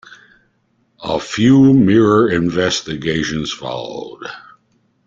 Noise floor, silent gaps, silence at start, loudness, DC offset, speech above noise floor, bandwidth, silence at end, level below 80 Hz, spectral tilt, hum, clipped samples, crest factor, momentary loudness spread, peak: -62 dBFS; none; 0.1 s; -15 LUFS; under 0.1%; 47 dB; 7.6 kHz; 0.7 s; -48 dBFS; -6 dB/octave; none; under 0.1%; 14 dB; 19 LU; -2 dBFS